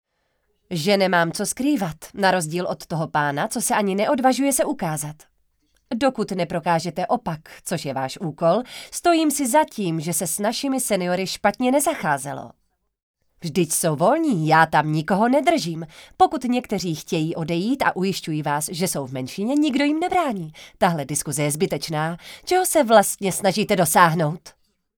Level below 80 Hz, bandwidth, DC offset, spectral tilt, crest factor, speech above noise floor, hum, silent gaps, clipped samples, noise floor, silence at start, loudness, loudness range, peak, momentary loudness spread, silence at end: -58 dBFS; over 20 kHz; under 0.1%; -4.5 dB/octave; 22 dB; 49 dB; none; 13.03-13.14 s; under 0.1%; -71 dBFS; 0.7 s; -21 LUFS; 4 LU; 0 dBFS; 10 LU; 0.45 s